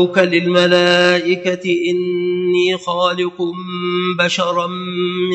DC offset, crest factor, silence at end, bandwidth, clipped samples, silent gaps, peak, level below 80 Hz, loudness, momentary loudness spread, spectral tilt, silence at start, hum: under 0.1%; 16 dB; 0 s; 8.4 kHz; under 0.1%; none; 0 dBFS; -66 dBFS; -16 LUFS; 9 LU; -5 dB/octave; 0 s; none